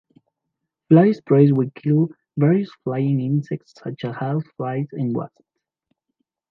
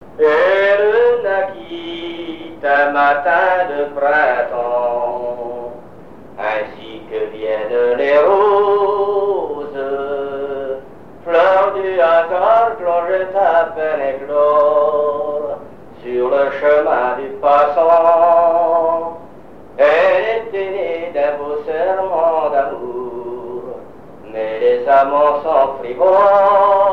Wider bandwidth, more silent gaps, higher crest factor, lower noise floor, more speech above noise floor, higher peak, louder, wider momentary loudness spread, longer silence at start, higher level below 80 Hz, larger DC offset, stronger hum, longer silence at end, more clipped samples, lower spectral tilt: about the same, 5.8 kHz vs 6 kHz; neither; about the same, 18 dB vs 14 dB; first, -80 dBFS vs -39 dBFS; first, 61 dB vs 26 dB; about the same, -2 dBFS vs 0 dBFS; second, -20 LUFS vs -15 LUFS; about the same, 14 LU vs 15 LU; first, 0.9 s vs 0 s; second, -70 dBFS vs -54 dBFS; second, under 0.1% vs 0.9%; neither; first, 1.25 s vs 0 s; neither; first, -10.5 dB/octave vs -6 dB/octave